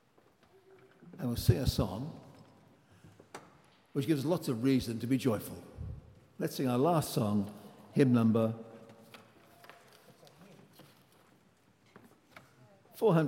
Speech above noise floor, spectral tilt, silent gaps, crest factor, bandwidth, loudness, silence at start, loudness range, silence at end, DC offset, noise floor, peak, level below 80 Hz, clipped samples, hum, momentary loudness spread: 37 dB; -7 dB/octave; none; 24 dB; 16.5 kHz; -32 LUFS; 1 s; 5 LU; 0 s; under 0.1%; -67 dBFS; -12 dBFS; -56 dBFS; under 0.1%; none; 24 LU